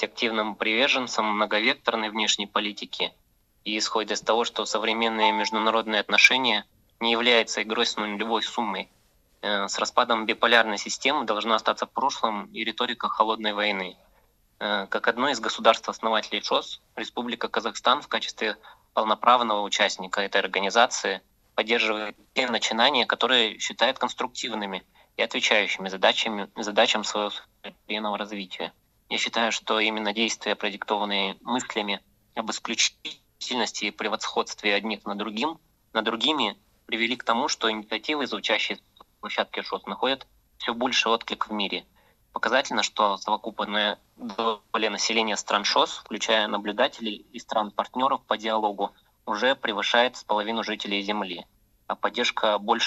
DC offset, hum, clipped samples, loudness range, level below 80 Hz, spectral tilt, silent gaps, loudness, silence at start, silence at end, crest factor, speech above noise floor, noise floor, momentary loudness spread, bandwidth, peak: under 0.1%; none; under 0.1%; 5 LU; -68 dBFS; -2 dB/octave; none; -25 LUFS; 0 s; 0 s; 24 dB; 37 dB; -63 dBFS; 11 LU; 13 kHz; -2 dBFS